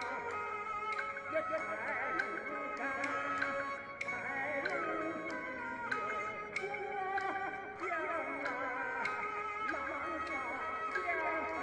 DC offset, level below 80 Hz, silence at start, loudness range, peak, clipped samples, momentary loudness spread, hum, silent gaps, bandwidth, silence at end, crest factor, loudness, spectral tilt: under 0.1%; -70 dBFS; 0 s; 1 LU; -22 dBFS; under 0.1%; 4 LU; none; none; 11 kHz; 0 s; 18 dB; -38 LUFS; -4 dB/octave